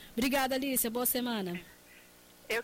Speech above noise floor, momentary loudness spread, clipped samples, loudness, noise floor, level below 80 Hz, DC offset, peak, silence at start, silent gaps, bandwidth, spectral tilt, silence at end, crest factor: 26 dB; 9 LU; under 0.1%; -31 LUFS; -57 dBFS; -58 dBFS; under 0.1%; -18 dBFS; 0 s; none; 16.5 kHz; -3 dB/octave; 0 s; 16 dB